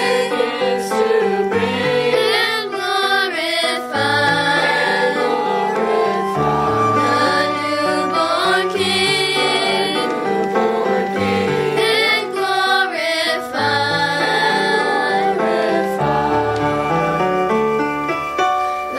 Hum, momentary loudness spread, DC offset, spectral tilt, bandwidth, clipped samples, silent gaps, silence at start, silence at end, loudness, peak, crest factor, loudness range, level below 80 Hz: none; 4 LU; under 0.1%; -4 dB/octave; 16 kHz; under 0.1%; none; 0 s; 0 s; -17 LUFS; -4 dBFS; 12 dB; 1 LU; -50 dBFS